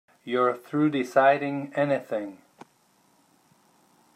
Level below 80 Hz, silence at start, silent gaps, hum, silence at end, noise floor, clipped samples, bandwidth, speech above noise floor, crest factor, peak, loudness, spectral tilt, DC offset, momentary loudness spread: -80 dBFS; 0.25 s; none; none; 1.8 s; -64 dBFS; under 0.1%; 15 kHz; 39 dB; 20 dB; -8 dBFS; -25 LUFS; -6.5 dB/octave; under 0.1%; 12 LU